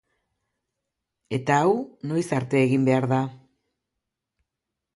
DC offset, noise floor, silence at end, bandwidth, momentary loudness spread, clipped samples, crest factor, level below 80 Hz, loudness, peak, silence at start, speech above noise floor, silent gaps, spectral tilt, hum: under 0.1%; -85 dBFS; 1.6 s; 11.5 kHz; 9 LU; under 0.1%; 18 dB; -66 dBFS; -23 LUFS; -8 dBFS; 1.3 s; 62 dB; none; -7 dB/octave; none